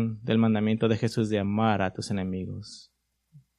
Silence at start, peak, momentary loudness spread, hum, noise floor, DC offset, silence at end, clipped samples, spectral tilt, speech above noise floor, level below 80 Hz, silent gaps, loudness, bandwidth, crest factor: 0 s; -8 dBFS; 14 LU; none; -58 dBFS; under 0.1%; 0.2 s; under 0.1%; -7 dB/octave; 32 dB; -62 dBFS; none; -26 LUFS; 11.5 kHz; 18 dB